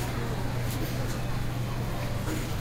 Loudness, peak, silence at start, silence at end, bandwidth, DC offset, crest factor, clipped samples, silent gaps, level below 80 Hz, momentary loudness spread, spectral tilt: -32 LUFS; -18 dBFS; 0 s; 0 s; 16 kHz; under 0.1%; 12 dB; under 0.1%; none; -36 dBFS; 1 LU; -5.5 dB/octave